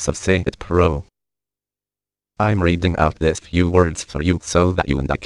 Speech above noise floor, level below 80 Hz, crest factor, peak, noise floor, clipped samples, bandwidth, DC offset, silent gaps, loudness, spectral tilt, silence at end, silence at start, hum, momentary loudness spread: over 72 dB; -32 dBFS; 20 dB; 0 dBFS; under -90 dBFS; under 0.1%; 11 kHz; under 0.1%; none; -19 LUFS; -6 dB/octave; 0 s; 0 s; 50 Hz at -50 dBFS; 4 LU